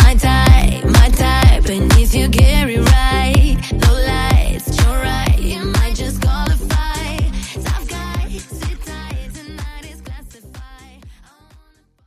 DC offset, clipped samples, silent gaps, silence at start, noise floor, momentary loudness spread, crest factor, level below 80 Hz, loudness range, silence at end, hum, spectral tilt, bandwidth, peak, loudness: under 0.1%; under 0.1%; none; 0 s; -51 dBFS; 17 LU; 14 dB; -16 dBFS; 17 LU; 0.95 s; none; -5 dB/octave; 15.5 kHz; 0 dBFS; -15 LUFS